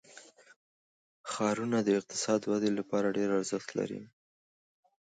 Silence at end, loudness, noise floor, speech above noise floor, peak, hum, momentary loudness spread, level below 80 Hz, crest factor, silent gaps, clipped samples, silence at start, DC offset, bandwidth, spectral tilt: 1 s; -32 LUFS; -56 dBFS; 25 dB; -16 dBFS; none; 9 LU; -76 dBFS; 18 dB; 0.56-1.24 s; under 0.1%; 0.1 s; under 0.1%; 9.4 kHz; -4.5 dB/octave